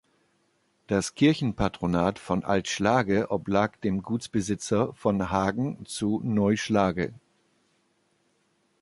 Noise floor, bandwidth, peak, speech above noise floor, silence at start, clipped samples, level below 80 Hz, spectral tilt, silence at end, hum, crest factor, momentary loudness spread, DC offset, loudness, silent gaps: -70 dBFS; 11.5 kHz; -8 dBFS; 44 dB; 0.9 s; under 0.1%; -50 dBFS; -5.5 dB/octave; 1.65 s; none; 20 dB; 7 LU; under 0.1%; -26 LUFS; none